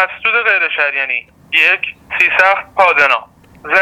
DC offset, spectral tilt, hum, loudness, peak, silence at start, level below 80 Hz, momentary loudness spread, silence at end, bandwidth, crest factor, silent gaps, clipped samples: under 0.1%; -2 dB/octave; none; -12 LUFS; 0 dBFS; 0 s; -54 dBFS; 8 LU; 0 s; 19 kHz; 14 dB; none; under 0.1%